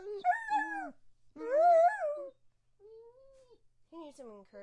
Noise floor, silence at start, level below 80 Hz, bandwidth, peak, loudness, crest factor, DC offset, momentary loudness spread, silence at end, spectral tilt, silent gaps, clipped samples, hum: -67 dBFS; 0 s; -76 dBFS; 9.4 kHz; -18 dBFS; -30 LUFS; 16 dB; under 0.1%; 26 LU; 0 s; -3.5 dB/octave; none; under 0.1%; none